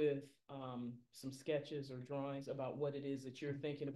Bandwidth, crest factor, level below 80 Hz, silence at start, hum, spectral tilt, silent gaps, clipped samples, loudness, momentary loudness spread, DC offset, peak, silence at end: 12 kHz; 16 dB; -84 dBFS; 0 s; none; -6.5 dB/octave; none; under 0.1%; -45 LUFS; 9 LU; under 0.1%; -28 dBFS; 0 s